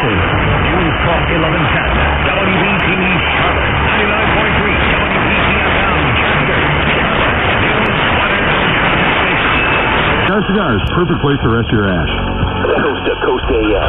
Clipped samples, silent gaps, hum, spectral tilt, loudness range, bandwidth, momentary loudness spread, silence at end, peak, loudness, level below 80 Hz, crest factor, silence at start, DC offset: under 0.1%; none; none; -9 dB/octave; 2 LU; 4.1 kHz; 3 LU; 0 s; 0 dBFS; -12 LUFS; -24 dBFS; 12 dB; 0 s; under 0.1%